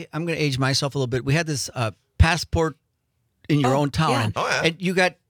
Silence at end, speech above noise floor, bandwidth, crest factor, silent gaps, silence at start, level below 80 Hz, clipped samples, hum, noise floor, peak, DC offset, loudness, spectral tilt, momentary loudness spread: 0.15 s; 50 dB; 19 kHz; 20 dB; none; 0 s; -36 dBFS; under 0.1%; none; -72 dBFS; -2 dBFS; under 0.1%; -22 LUFS; -5 dB/octave; 7 LU